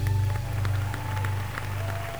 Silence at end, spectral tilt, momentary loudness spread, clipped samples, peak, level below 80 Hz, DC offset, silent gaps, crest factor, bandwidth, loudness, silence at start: 0 s; -6 dB/octave; 4 LU; under 0.1%; -14 dBFS; -40 dBFS; 0.8%; none; 14 dB; over 20 kHz; -29 LUFS; 0 s